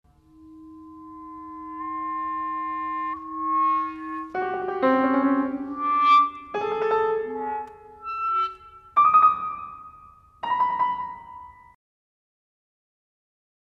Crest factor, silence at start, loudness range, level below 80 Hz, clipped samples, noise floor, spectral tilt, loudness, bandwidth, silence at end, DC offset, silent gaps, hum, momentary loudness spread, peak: 18 dB; 0.4 s; 8 LU; -62 dBFS; under 0.1%; -51 dBFS; -6 dB/octave; -24 LUFS; 7 kHz; 2.25 s; under 0.1%; none; none; 23 LU; -8 dBFS